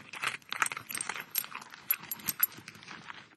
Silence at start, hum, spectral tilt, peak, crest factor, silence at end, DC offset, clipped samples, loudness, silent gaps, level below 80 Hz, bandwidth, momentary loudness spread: 0 s; none; 0 dB/octave; -6 dBFS; 32 dB; 0 s; under 0.1%; under 0.1%; -33 LUFS; none; -82 dBFS; 15 kHz; 16 LU